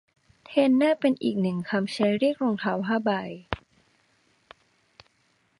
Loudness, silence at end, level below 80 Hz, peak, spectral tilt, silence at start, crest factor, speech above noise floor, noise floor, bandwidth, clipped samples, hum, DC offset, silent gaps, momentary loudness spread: -25 LUFS; 2.05 s; -60 dBFS; -6 dBFS; -7 dB/octave; 0.5 s; 22 dB; 44 dB; -68 dBFS; 11 kHz; under 0.1%; none; under 0.1%; none; 12 LU